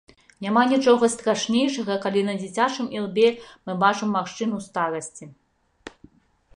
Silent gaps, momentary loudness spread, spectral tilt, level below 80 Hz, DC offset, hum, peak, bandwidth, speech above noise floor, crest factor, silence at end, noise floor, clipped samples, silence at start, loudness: none; 14 LU; -4.5 dB/octave; -66 dBFS; under 0.1%; none; -4 dBFS; 11 kHz; 35 dB; 20 dB; 0.7 s; -57 dBFS; under 0.1%; 0.4 s; -23 LUFS